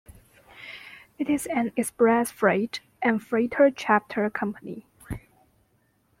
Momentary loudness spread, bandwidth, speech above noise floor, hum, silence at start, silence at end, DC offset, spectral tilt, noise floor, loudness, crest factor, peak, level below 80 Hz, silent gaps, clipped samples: 19 LU; 16.5 kHz; 43 dB; none; 0.55 s; 1 s; under 0.1%; -5 dB/octave; -67 dBFS; -24 LUFS; 20 dB; -6 dBFS; -56 dBFS; none; under 0.1%